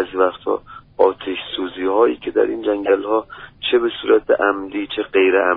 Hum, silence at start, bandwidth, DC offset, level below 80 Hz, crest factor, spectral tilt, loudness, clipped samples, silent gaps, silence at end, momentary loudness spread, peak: none; 0 s; 4.1 kHz; under 0.1%; -54 dBFS; 18 dB; -1.5 dB/octave; -19 LUFS; under 0.1%; none; 0 s; 10 LU; -2 dBFS